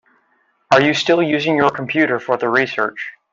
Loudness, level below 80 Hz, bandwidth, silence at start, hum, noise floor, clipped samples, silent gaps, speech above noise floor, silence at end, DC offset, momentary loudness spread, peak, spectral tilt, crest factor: -16 LUFS; -60 dBFS; 7.6 kHz; 0.7 s; none; -62 dBFS; under 0.1%; none; 45 dB; 0.2 s; under 0.1%; 7 LU; 0 dBFS; -5 dB/octave; 16 dB